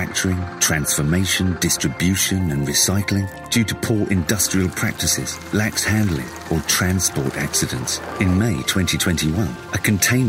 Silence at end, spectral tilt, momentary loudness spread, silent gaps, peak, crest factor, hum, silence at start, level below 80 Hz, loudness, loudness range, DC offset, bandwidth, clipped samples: 0 s; -3.5 dB/octave; 6 LU; none; -2 dBFS; 18 dB; none; 0 s; -40 dBFS; -19 LUFS; 1 LU; under 0.1%; 16.5 kHz; under 0.1%